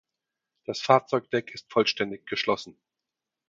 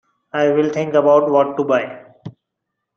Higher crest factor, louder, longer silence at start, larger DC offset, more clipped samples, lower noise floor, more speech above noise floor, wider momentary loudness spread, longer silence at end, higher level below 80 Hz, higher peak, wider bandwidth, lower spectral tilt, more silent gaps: first, 24 dB vs 16 dB; second, -26 LUFS vs -16 LUFS; first, 0.7 s vs 0.35 s; neither; neither; first, -87 dBFS vs -78 dBFS; about the same, 61 dB vs 63 dB; about the same, 12 LU vs 14 LU; about the same, 0.75 s vs 0.65 s; about the same, -70 dBFS vs -66 dBFS; about the same, -4 dBFS vs -2 dBFS; first, 7.8 kHz vs 6.8 kHz; second, -4.5 dB/octave vs -7 dB/octave; neither